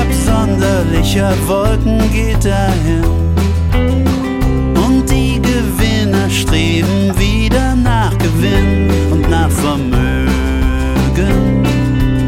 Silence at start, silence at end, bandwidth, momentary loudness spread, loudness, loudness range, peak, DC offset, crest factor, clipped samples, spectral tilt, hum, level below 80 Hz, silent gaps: 0 s; 0 s; 16.5 kHz; 2 LU; -13 LUFS; 1 LU; 0 dBFS; under 0.1%; 12 dB; under 0.1%; -6 dB/octave; none; -18 dBFS; none